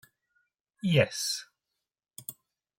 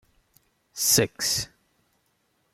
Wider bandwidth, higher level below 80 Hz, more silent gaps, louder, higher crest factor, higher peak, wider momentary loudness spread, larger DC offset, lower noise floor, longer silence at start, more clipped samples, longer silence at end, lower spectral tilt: about the same, 16.5 kHz vs 16.5 kHz; second, -68 dBFS vs -58 dBFS; neither; second, -28 LUFS vs -23 LUFS; about the same, 24 dB vs 22 dB; about the same, -10 dBFS vs -8 dBFS; about the same, 18 LU vs 18 LU; neither; first, -87 dBFS vs -71 dBFS; about the same, 0.85 s vs 0.75 s; neither; second, 0.45 s vs 1.1 s; first, -4.5 dB/octave vs -2 dB/octave